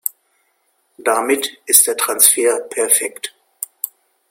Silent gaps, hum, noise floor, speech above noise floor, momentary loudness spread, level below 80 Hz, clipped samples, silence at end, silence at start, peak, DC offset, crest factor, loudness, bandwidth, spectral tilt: none; none; -64 dBFS; 48 dB; 19 LU; -68 dBFS; under 0.1%; 0.4 s; 0.05 s; 0 dBFS; under 0.1%; 18 dB; -14 LUFS; 17 kHz; 1 dB/octave